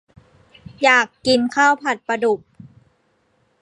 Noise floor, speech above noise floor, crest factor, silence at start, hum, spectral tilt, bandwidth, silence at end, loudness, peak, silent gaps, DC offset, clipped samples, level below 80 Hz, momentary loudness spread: -63 dBFS; 46 dB; 20 dB; 0.8 s; none; -3 dB/octave; 11 kHz; 1.25 s; -17 LUFS; 0 dBFS; none; under 0.1%; under 0.1%; -58 dBFS; 7 LU